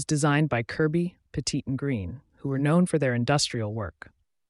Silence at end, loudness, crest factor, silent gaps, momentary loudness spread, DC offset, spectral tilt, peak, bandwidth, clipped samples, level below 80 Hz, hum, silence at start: 0.6 s; -26 LUFS; 16 dB; none; 10 LU; under 0.1%; -5.5 dB/octave; -10 dBFS; 11.5 kHz; under 0.1%; -54 dBFS; none; 0 s